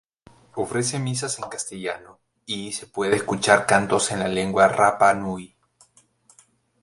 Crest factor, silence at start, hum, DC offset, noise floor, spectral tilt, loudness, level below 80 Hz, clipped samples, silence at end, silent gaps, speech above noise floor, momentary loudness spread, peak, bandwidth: 22 dB; 0.55 s; none; under 0.1%; -59 dBFS; -3.5 dB/octave; -22 LUFS; -58 dBFS; under 0.1%; 1.35 s; none; 37 dB; 14 LU; 0 dBFS; 11.5 kHz